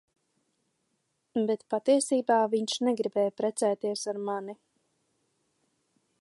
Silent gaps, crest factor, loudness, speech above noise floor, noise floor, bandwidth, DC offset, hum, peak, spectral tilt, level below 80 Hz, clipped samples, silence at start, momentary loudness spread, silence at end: none; 18 dB; -28 LUFS; 50 dB; -77 dBFS; 11.5 kHz; under 0.1%; none; -12 dBFS; -4 dB/octave; -84 dBFS; under 0.1%; 1.35 s; 9 LU; 1.65 s